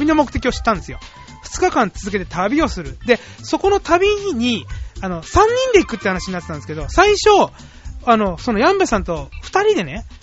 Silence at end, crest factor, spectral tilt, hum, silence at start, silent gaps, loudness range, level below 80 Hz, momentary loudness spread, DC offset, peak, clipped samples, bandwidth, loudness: 0.05 s; 18 dB; -3.5 dB/octave; none; 0 s; none; 4 LU; -32 dBFS; 13 LU; under 0.1%; 0 dBFS; under 0.1%; 8 kHz; -17 LUFS